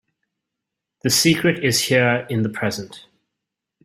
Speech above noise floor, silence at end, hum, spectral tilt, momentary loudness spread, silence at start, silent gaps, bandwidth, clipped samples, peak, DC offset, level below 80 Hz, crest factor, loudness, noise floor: 64 dB; 0.85 s; none; -3.5 dB/octave; 11 LU; 1.05 s; none; 16 kHz; under 0.1%; -2 dBFS; under 0.1%; -56 dBFS; 20 dB; -18 LUFS; -83 dBFS